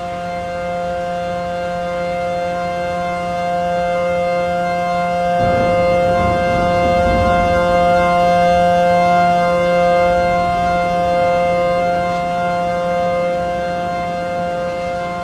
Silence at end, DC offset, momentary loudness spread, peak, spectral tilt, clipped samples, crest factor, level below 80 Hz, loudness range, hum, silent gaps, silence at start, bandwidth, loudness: 0 s; under 0.1%; 8 LU; -4 dBFS; -6 dB/octave; under 0.1%; 12 dB; -34 dBFS; 6 LU; none; none; 0 s; 12.5 kHz; -16 LUFS